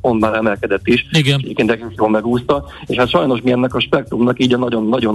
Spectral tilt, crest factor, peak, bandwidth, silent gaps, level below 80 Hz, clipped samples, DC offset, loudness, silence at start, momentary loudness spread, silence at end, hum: -6.5 dB/octave; 12 dB; -2 dBFS; 12 kHz; none; -42 dBFS; under 0.1%; under 0.1%; -16 LUFS; 0.05 s; 4 LU; 0 s; none